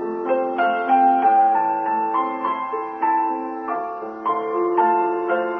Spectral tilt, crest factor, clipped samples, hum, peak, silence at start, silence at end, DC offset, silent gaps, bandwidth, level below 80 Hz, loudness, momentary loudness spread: -7.5 dB/octave; 14 dB; under 0.1%; none; -6 dBFS; 0 s; 0 s; under 0.1%; none; 4.5 kHz; -68 dBFS; -20 LUFS; 11 LU